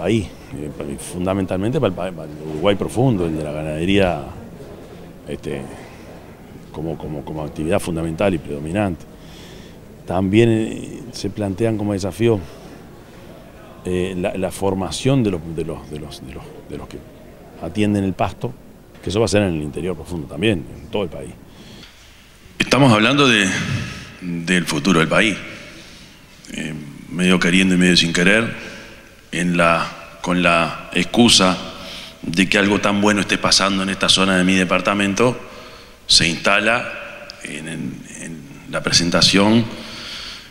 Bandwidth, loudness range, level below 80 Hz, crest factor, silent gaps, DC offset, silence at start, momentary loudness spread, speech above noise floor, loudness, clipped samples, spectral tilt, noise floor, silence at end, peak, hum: 16 kHz; 9 LU; -42 dBFS; 20 dB; none; under 0.1%; 0 s; 21 LU; 27 dB; -18 LUFS; under 0.1%; -4 dB/octave; -45 dBFS; 0 s; 0 dBFS; none